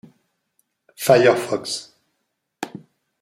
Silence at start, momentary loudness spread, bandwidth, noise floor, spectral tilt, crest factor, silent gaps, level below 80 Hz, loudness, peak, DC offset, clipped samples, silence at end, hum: 1 s; 20 LU; 16 kHz; -75 dBFS; -4.5 dB/octave; 20 dB; none; -68 dBFS; -19 LUFS; -2 dBFS; under 0.1%; under 0.1%; 0.55 s; none